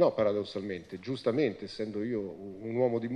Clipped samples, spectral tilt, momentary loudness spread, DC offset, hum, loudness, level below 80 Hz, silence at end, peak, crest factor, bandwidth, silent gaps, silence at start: under 0.1%; -7.5 dB/octave; 10 LU; under 0.1%; none; -33 LUFS; -66 dBFS; 0 s; -12 dBFS; 18 dB; 9.8 kHz; none; 0 s